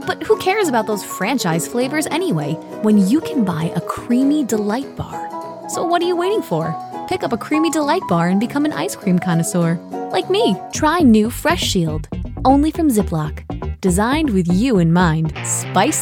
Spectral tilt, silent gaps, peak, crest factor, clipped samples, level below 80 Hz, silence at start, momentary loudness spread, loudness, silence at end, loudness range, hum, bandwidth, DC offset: -5.5 dB/octave; none; -2 dBFS; 16 dB; under 0.1%; -36 dBFS; 0 s; 10 LU; -18 LUFS; 0 s; 3 LU; none; 18 kHz; under 0.1%